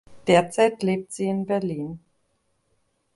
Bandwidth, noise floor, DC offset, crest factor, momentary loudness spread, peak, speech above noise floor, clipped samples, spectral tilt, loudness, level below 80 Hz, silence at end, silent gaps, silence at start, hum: 11.5 kHz; -70 dBFS; under 0.1%; 20 dB; 13 LU; -4 dBFS; 48 dB; under 0.1%; -5.5 dB/octave; -23 LUFS; -62 dBFS; 1.15 s; none; 0.1 s; none